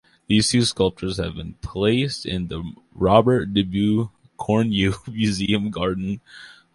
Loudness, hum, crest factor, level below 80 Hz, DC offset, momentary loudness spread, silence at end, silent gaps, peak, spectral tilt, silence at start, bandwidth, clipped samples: -21 LUFS; none; 20 dB; -42 dBFS; under 0.1%; 15 LU; 0.25 s; none; -2 dBFS; -5.5 dB/octave; 0.3 s; 11.5 kHz; under 0.1%